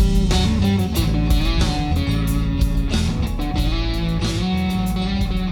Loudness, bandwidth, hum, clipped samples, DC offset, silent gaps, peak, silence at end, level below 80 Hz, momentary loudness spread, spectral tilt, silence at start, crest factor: -20 LUFS; 18 kHz; none; under 0.1%; under 0.1%; none; -6 dBFS; 0 s; -22 dBFS; 4 LU; -6 dB/octave; 0 s; 12 dB